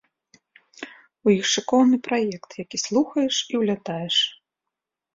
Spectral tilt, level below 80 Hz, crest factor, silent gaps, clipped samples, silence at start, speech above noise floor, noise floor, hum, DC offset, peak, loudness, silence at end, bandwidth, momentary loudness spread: -3.5 dB/octave; -68 dBFS; 18 dB; none; under 0.1%; 0.8 s; 63 dB; -85 dBFS; none; under 0.1%; -6 dBFS; -22 LUFS; 0.8 s; 7.8 kHz; 18 LU